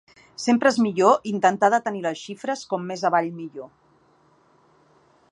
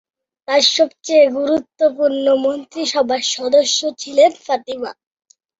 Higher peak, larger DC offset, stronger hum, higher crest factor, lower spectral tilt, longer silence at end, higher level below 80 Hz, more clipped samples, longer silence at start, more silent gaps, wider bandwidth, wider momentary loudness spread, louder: about the same, -2 dBFS vs 0 dBFS; neither; neither; about the same, 20 dB vs 16 dB; first, -5 dB/octave vs -1 dB/octave; first, 1.65 s vs 0.7 s; second, -72 dBFS vs -64 dBFS; neither; about the same, 0.4 s vs 0.5 s; neither; first, 10.5 kHz vs 7.8 kHz; first, 15 LU vs 9 LU; second, -22 LUFS vs -16 LUFS